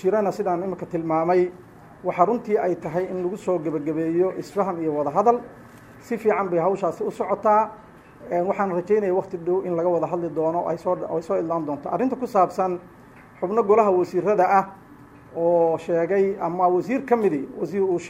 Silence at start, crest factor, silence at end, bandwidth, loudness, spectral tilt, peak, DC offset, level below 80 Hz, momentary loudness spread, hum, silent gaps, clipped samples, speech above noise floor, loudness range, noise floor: 0 s; 20 dB; 0 s; 13 kHz; -23 LUFS; -8 dB/octave; -4 dBFS; under 0.1%; -62 dBFS; 8 LU; none; none; under 0.1%; 24 dB; 3 LU; -47 dBFS